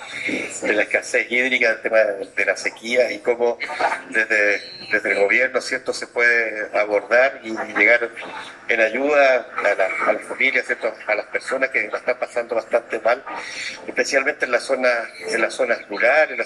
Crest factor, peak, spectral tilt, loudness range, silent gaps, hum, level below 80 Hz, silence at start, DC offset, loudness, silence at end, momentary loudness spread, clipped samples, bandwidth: 18 dB; -2 dBFS; -2 dB/octave; 4 LU; none; none; -68 dBFS; 0 s; under 0.1%; -19 LUFS; 0 s; 9 LU; under 0.1%; 12 kHz